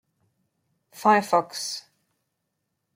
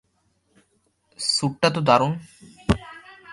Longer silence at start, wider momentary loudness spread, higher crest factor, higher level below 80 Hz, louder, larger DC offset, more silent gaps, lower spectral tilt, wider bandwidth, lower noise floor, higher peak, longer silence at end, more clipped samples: second, 0.95 s vs 1.2 s; second, 12 LU vs 16 LU; about the same, 22 dB vs 22 dB; second, -80 dBFS vs -42 dBFS; about the same, -23 LUFS vs -22 LUFS; neither; neither; about the same, -3.5 dB/octave vs -4.5 dB/octave; first, 16.5 kHz vs 11.5 kHz; first, -79 dBFS vs -68 dBFS; second, -6 dBFS vs -2 dBFS; first, 1.15 s vs 0 s; neither